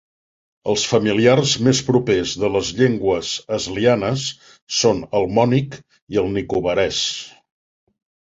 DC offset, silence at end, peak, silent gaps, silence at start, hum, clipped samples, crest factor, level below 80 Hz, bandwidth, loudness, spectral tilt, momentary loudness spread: under 0.1%; 1.1 s; -2 dBFS; 4.62-4.67 s, 6.02-6.07 s; 0.65 s; none; under 0.1%; 18 dB; -48 dBFS; 8 kHz; -19 LUFS; -4.5 dB/octave; 9 LU